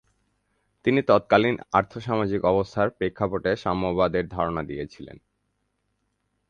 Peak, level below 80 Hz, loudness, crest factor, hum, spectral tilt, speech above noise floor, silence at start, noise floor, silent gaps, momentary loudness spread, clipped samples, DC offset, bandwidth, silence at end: -4 dBFS; -50 dBFS; -24 LUFS; 22 dB; none; -7.5 dB/octave; 51 dB; 0.85 s; -74 dBFS; none; 12 LU; under 0.1%; under 0.1%; 7.4 kHz; 1.35 s